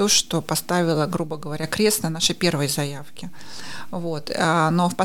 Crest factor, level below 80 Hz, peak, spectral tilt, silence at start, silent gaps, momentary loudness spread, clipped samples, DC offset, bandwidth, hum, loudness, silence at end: 18 dB; -54 dBFS; -4 dBFS; -3.5 dB/octave; 0 s; none; 17 LU; under 0.1%; under 0.1%; 17.5 kHz; none; -22 LUFS; 0 s